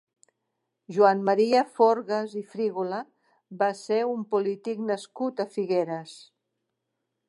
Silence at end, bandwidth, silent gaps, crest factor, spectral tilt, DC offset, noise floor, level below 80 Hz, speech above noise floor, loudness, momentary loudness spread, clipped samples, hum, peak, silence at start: 1.1 s; 11.5 kHz; none; 20 dB; -6 dB/octave; under 0.1%; -81 dBFS; -86 dBFS; 56 dB; -26 LUFS; 12 LU; under 0.1%; none; -6 dBFS; 0.9 s